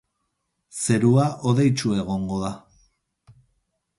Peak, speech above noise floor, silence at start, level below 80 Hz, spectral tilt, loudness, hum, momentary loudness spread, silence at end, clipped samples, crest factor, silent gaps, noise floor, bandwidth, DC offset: -6 dBFS; 55 dB; 0.75 s; -52 dBFS; -6 dB/octave; -22 LUFS; none; 13 LU; 1.4 s; under 0.1%; 18 dB; none; -76 dBFS; 11.5 kHz; under 0.1%